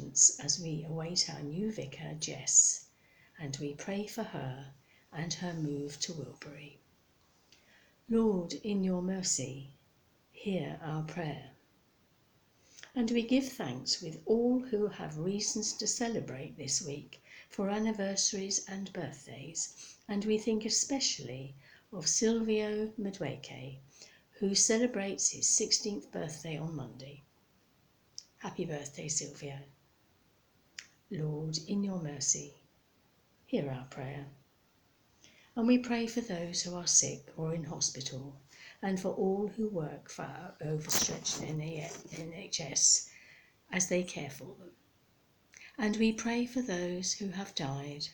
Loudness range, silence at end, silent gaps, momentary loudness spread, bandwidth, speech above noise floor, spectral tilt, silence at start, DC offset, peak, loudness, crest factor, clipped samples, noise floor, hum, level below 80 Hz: 10 LU; 0 s; none; 19 LU; over 20 kHz; 35 dB; -3 dB/octave; 0 s; under 0.1%; -10 dBFS; -33 LUFS; 24 dB; under 0.1%; -69 dBFS; none; -66 dBFS